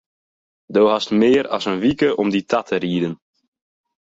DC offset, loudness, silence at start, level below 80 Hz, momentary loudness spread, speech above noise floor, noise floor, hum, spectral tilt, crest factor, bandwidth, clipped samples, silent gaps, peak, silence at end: under 0.1%; -18 LUFS; 0.7 s; -56 dBFS; 7 LU; over 72 dB; under -90 dBFS; none; -6 dB/octave; 16 dB; 8 kHz; under 0.1%; none; -4 dBFS; 1 s